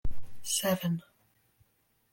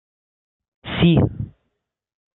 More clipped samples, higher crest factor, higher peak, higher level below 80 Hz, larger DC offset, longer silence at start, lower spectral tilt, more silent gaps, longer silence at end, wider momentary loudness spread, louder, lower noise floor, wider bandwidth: neither; about the same, 16 dB vs 20 dB; second, -16 dBFS vs -4 dBFS; about the same, -46 dBFS vs -42 dBFS; neither; second, 0.05 s vs 0.85 s; second, -4 dB/octave vs -12 dB/octave; neither; first, 1.1 s vs 0.85 s; second, 15 LU vs 19 LU; second, -32 LUFS vs -19 LUFS; second, -72 dBFS vs -76 dBFS; first, 17 kHz vs 4.1 kHz